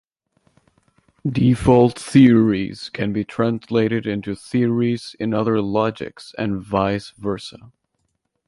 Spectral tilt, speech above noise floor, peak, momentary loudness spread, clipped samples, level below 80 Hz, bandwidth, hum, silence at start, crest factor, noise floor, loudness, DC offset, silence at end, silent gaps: -7.5 dB/octave; 53 dB; -2 dBFS; 13 LU; under 0.1%; -46 dBFS; 11.5 kHz; none; 1.25 s; 18 dB; -72 dBFS; -19 LUFS; under 0.1%; 0.95 s; none